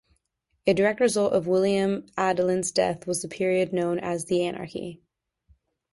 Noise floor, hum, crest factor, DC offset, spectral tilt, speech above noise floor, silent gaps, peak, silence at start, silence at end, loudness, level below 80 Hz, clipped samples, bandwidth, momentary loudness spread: -75 dBFS; none; 18 dB; under 0.1%; -5 dB/octave; 50 dB; none; -8 dBFS; 0.65 s; 1 s; -25 LUFS; -62 dBFS; under 0.1%; 11.5 kHz; 8 LU